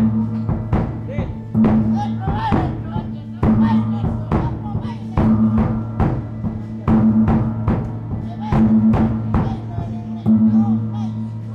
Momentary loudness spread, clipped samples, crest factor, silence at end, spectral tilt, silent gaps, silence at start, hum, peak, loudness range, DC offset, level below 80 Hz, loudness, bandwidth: 11 LU; under 0.1%; 14 dB; 0 s; -10 dB/octave; none; 0 s; none; -2 dBFS; 2 LU; under 0.1%; -32 dBFS; -19 LUFS; 5.6 kHz